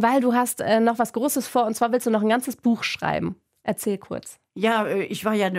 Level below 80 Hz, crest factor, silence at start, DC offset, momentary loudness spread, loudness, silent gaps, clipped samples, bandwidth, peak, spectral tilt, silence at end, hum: -62 dBFS; 16 dB; 0 s; under 0.1%; 10 LU; -23 LUFS; none; under 0.1%; 16 kHz; -8 dBFS; -4.5 dB/octave; 0 s; none